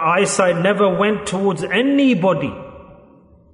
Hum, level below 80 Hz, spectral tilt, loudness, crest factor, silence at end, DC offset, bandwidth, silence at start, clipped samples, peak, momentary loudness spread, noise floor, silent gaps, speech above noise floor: none; -54 dBFS; -5 dB/octave; -17 LUFS; 14 dB; 0.6 s; under 0.1%; 11 kHz; 0 s; under 0.1%; -2 dBFS; 6 LU; -48 dBFS; none; 32 dB